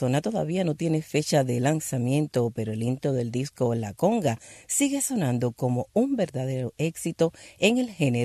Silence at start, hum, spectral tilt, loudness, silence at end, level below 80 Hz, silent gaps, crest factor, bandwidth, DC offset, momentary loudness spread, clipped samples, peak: 0 s; none; -5.5 dB/octave; -26 LUFS; 0 s; -62 dBFS; none; 18 dB; 14.5 kHz; under 0.1%; 6 LU; under 0.1%; -8 dBFS